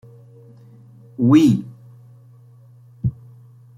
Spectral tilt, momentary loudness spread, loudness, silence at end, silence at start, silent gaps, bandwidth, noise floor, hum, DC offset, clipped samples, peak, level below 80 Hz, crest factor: -8 dB/octave; 24 LU; -18 LUFS; 0.65 s; 1.2 s; none; 12.5 kHz; -47 dBFS; none; under 0.1%; under 0.1%; -2 dBFS; -52 dBFS; 20 dB